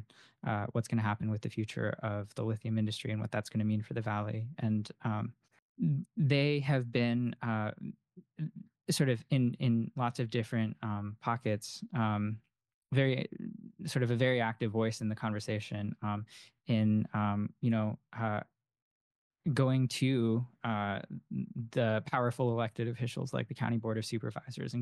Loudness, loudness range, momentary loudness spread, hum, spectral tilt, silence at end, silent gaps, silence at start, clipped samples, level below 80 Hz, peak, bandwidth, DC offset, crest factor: -34 LUFS; 2 LU; 10 LU; none; -6.5 dB/octave; 0 s; 5.59-5.75 s, 12.74-12.82 s, 18.82-19.31 s; 0 s; under 0.1%; -72 dBFS; -16 dBFS; 12 kHz; under 0.1%; 18 dB